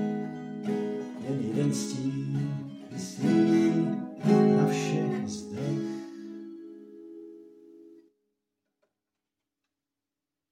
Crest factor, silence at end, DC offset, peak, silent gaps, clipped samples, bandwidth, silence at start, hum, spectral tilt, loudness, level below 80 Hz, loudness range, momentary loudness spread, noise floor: 20 dB; 2.55 s; under 0.1%; -10 dBFS; none; under 0.1%; 14 kHz; 0 s; none; -7 dB/octave; -28 LUFS; -76 dBFS; 14 LU; 22 LU; -89 dBFS